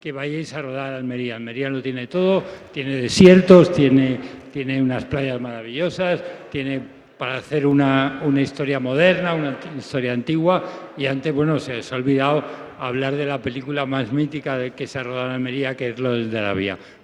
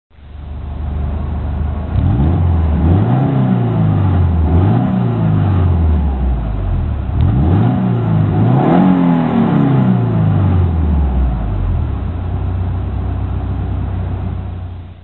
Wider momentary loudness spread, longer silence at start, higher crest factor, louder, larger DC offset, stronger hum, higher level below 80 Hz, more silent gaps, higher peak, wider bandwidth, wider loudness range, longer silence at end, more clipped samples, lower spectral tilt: first, 12 LU vs 9 LU; second, 0.05 s vs 0.2 s; first, 20 dB vs 14 dB; second, -20 LUFS vs -15 LUFS; second, under 0.1% vs 0.8%; neither; second, -52 dBFS vs -20 dBFS; neither; about the same, 0 dBFS vs 0 dBFS; first, 11 kHz vs 4.2 kHz; about the same, 8 LU vs 6 LU; about the same, 0.15 s vs 0.1 s; neither; second, -6.5 dB/octave vs -12 dB/octave